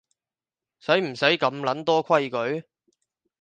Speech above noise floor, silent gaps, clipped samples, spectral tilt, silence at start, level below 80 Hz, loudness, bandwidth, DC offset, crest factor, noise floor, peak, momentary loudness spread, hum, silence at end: over 67 dB; none; under 0.1%; -5 dB/octave; 0.85 s; -76 dBFS; -23 LUFS; 9 kHz; under 0.1%; 22 dB; under -90 dBFS; -4 dBFS; 9 LU; none; 0.8 s